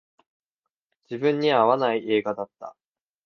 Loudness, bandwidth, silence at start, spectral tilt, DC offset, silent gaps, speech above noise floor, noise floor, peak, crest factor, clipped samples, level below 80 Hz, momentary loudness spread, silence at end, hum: -23 LUFS; 6.4 kHz; 1.1 s; -7 dB/octave; under 0.1%; none; 63 dB; -86 dBFS; -6 dBFS; 20 dB; under 0.1%; -74 dBFS; 19 LU; 0.55 s; none